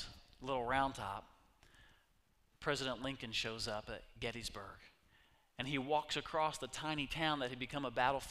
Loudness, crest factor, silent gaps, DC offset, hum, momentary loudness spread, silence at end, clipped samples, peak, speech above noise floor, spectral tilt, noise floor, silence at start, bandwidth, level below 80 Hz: -40 LUFS; 24 dB; none; under 0.1%; none; 14 LU; 0 s; under 0.1%; -18 dBFS; 35 dB; -4 dB/octave; -75 dBFS; 0 s; 15.5 kHz; -60 dBFS